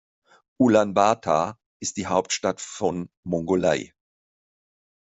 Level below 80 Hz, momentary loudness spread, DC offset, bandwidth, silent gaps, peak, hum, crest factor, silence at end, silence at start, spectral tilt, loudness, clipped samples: -62 dBFS; 12 LU; under 0.1%; 8.2 kHz; 1.66-1.80 s, 3.17-3.23 s; -4 dBFS; none; 20 dB; 1.2 s; 0.6 s; -4.5 dB/octave; -24 LUFS; under 0.1%